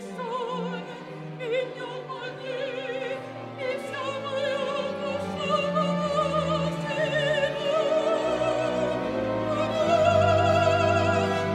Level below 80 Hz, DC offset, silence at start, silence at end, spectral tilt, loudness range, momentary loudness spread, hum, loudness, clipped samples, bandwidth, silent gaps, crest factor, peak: -56 dBFS; under 0.1%; 0 s; 0 s; -5.5 dB/octave; 9 LU; 13 LU; none; -26 LUFS; under 0.1%; 12 kHz; none; 16 dB; -10 dBFS